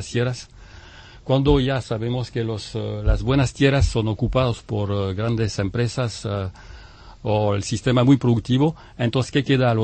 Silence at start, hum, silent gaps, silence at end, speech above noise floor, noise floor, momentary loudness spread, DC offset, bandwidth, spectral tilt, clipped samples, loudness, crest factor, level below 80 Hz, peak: 0 s; none; none; 0 s; 23 dB; -43 dBFS; 9 LU; under 0.1%; 8.8 kHz; -6.5 dB/octave; under 0.1%; -22 LUFS; 16 dB; -32 dBFS; -4 dBFS